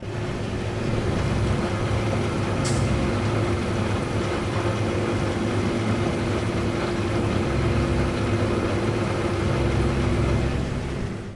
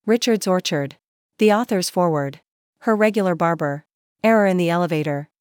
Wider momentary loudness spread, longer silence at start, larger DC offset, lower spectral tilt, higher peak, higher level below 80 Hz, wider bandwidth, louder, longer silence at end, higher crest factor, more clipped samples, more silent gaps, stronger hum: second, 3 LU vs 10 LU; about the same, 0 s vs 0.05 s; neither; about the same, -6.5 dB/octave vs -5.5 dB/octave; second, -10 dBFS vs -6 dBFS; first, -34 dBFS vs -78 dBFS; second, 11.5 kHz vs 19.5 kHz; second, -24 LUFS vs -20 LUFS; second, 0 s vs 0.35 s; about the same, 12 dB vs 16 dB; neither; second, none vs 1.07-1.29 s, 2.51-2.73 s, 3.94-4.16 s; neither